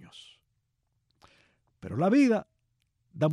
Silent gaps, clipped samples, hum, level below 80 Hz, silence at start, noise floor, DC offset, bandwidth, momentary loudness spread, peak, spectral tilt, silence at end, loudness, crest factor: none; under 0.1%; none; -70 dBFS; 0.15 s; -77 dBFS; under 0.1%; 10.5 kHz; 24 LU; -12 dBFS; -7.5 dB/octave; 0 s; -26 LUFS; 18 dB